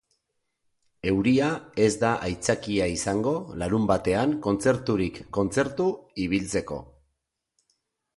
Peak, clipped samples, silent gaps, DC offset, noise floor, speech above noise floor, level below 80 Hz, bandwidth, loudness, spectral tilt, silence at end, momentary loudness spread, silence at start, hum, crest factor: -8 dBFS; under 0.1%; none; under 0.1%; -80 dBFS; 55 dB; -50 dBFS; 11.5 kHz; -26 LUFS; -5.5 dB/octave; 1.3 s; 7 LU; 1.05 s; none; 20 dB